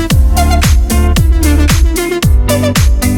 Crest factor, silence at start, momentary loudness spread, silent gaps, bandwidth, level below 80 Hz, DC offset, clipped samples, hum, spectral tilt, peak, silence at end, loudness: 8 dB; 0 s; 2 LU; none; 19 kHz; -10 dBFS; under 0.1%; under 0.1%; none; -5 dB/octave; 0 dBFS; 0 s; -10 LUFS